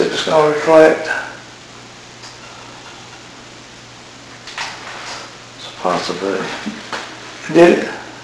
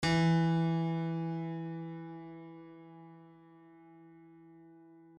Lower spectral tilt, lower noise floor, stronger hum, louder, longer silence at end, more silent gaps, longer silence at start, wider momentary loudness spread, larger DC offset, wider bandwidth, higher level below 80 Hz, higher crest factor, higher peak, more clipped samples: second, -4.5 dB/octave vs -7 dB/octave; second, -38 dBFS vs -58 dBFS; neither; first, -15 LUFS vs -33 LUFS; second, 0 s vs 0.45 s; neither; about the same, 0 s vs 0 s; about the same, 25 LU vs 25 LU; neither; first, 11 kHz vs 9.4 kHz; first, -56 dBFS vs -64 dBFS; about the same, 18 dB vs 16 dB; first, 0 dBFS vs -20 dBFS; first, 0.3% vs under 0.1%